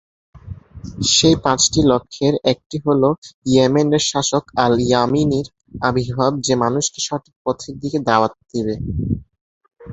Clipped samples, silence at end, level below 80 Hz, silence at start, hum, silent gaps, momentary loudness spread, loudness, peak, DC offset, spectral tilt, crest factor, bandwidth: under 0.1%; 0 s; -42 dBFS; 0.35 s; none; 2.66-2.70 s, 3.18-3.22 s, 3.34-3.42 s, 7.36-7.45 s, 9.41-9.61 s; 11 LU; -18 LUFS; 0 dBFS; under 0.1%; -4.5 dB/octave; 18 dB; 8.4 kHz